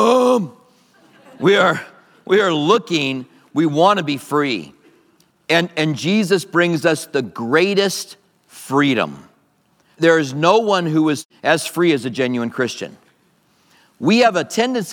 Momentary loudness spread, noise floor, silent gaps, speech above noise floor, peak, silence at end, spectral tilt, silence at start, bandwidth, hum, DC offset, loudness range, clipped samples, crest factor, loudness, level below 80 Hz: 10 LU; -59 dBFS; 11.25-11.29 s; 43 dB; 0 dBFS; 0 s; -5 dB/octave; 0 s; 19 kHz; none; under 0.1%; 2 LU; under 0.1%; 18 dB; -17 LUFS; -70 dBFS